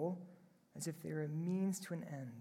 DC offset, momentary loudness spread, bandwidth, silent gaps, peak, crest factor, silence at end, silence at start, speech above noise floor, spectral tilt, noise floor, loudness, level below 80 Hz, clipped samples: under 0.1%; 12 LU; 16 kHz; none; -28 dBFS; 14 dB; 0 s; 0 s; 22 dB; -6.5 dB/octave; -64 dBFS; -43 LUFS; -86 dBFS; under 0.1%